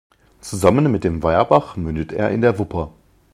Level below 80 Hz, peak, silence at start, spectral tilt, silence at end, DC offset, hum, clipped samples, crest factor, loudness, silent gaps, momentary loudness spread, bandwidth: -38 dBFS; 0 dBFS; 0.45 s; -7 dB/octave; 0.45 s; under 0.1%; none; under 0.1%; 18 dB; -18 LUFS; none; 13 LU; 14 kHz